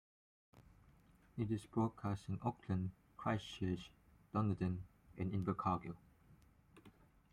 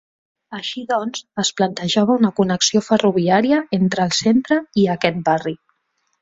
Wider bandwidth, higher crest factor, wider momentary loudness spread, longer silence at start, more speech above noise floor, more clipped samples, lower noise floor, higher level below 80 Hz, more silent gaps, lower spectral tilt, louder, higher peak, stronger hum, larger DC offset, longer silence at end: first, 11 kHz vs 8 kHz; about the same, 20 dB vs 18 dB; about the same, 10 LU vs 11 LU; about the same, 0.55 s vs 0.5 s; second, 28 dB vs 52 dB; neither; about the same, -68 dBFS vs -69 dBFS; second, -68 dBFS vs -58 dBFS; neither; first, -8 dB/octave vs -4.5 dB/octave; second, -42 LUFS vs -18 LUFS; second, -24 dBFS vs 0 dBFS; neither; neither; second, 0.45 s vs 0.65 s